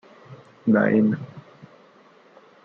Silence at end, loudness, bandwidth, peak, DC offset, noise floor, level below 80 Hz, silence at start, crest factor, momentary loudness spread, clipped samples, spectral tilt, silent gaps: 1.25 s; -21 LUFS; 4.3 kHz; -6 dBFS; under 0.1%; -53 dBFS; -70 dBFS; 0.3 s; 18 dB; 14 LU; under 0.1%; -10 dB/octave; none